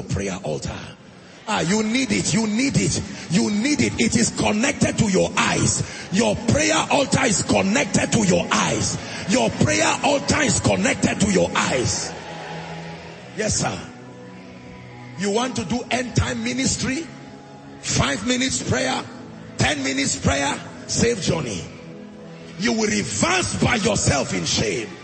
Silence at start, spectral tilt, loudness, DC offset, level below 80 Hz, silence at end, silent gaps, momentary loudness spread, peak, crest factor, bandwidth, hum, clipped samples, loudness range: 0 s; -4 dB/octave; -20 LUFS; under 0.1%; -46 dBFS; 0 s; none; 18 LU; -4 dBFS; 18 dB; 8.8 kHz; none; under 0.1%; 6 LU